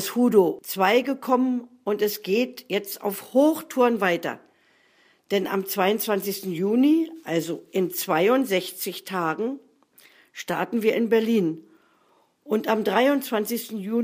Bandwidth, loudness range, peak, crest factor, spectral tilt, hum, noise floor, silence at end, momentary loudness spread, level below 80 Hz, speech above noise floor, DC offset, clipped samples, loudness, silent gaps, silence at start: 15.5 kHz; 3 LU; -6 dBFS; 18 dB; -5 dB/octave; none; -63 dBFS; 0 s; 9 LU; -78 dBFS; 40 dB; under 0.1%; under 0.1%; -24 LUFS; none; 0 s